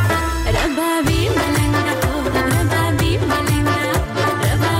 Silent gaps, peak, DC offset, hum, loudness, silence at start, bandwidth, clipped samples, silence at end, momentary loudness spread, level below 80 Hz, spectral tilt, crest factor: none; -6 dBFS; under 0.1%; none; -18 LUFS; 0 s; 16.5 kHz; under 0.1%; 0 s; 2 LU; -28 dBFS; -5 dB/octave; 12 dB